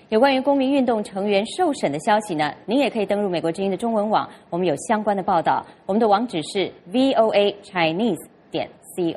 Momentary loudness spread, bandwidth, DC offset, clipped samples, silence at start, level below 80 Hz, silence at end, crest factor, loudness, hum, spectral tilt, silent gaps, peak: 8 LU; 12.5 kHz; under 0.1%; under 0.1%; 0.1 s; -62 dBFS; 0 s; 16 dB; -21 LUFS; none; -5 dB/octave; none; -4 dBFS